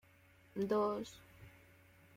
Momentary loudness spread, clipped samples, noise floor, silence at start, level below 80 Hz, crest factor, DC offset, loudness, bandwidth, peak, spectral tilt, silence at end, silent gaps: 25 LU; under 0.1%; -66 dBFS; 0.55 s; -72 dBFS; 18 dB; under 0.1%; -39 LUFS; 16 kHz; -24 dBFS; -6.5 dB/octave; 0.65 s; none